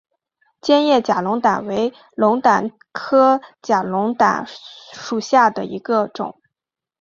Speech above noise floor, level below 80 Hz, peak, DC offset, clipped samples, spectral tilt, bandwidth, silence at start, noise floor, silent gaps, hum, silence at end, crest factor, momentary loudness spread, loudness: 68 dB; -64 dBFS; -2 dBFS; under 0.1%; under 0.1%; -5 dB/octave; 7.6 kHz; 0.65 s; -85 dBFS; none; none; 0.7 s; 16 dB; 15 LU; -18 LUFS